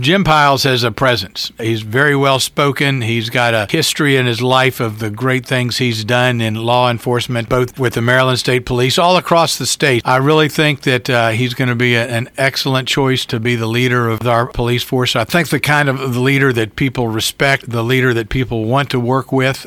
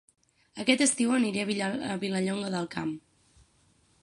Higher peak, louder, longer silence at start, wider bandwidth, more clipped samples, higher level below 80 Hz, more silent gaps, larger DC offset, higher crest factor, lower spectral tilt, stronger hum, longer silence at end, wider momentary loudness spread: first, 0 dBFS vs -6 dBFS; first, -14 LUFS vs -28 LUFS; second, 0 s vs 0.55 s; first, 18 kHz vs 11.5 kHz; neither; first, -40 dBFS vs -68 dBFS; neither; neither; second, 14 dB vs 24 dB; about the same, -4.5 dB/octave vs -3.5 dB/octave; neither; second, 0 s vs 1.05 s; second, 5 LU vs 12 LU